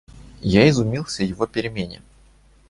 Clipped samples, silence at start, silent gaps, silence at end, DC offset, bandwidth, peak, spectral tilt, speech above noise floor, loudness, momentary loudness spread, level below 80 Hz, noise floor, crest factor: under 0.1%; 0.15 s; none; 0.75 s; under 0.1%; 11.5 kHz; -2 dBFS; -6 dB/octave; 33 dB; -20 LUFS; 14 LU; -42 dBFS; -53 dBFS; 20 dB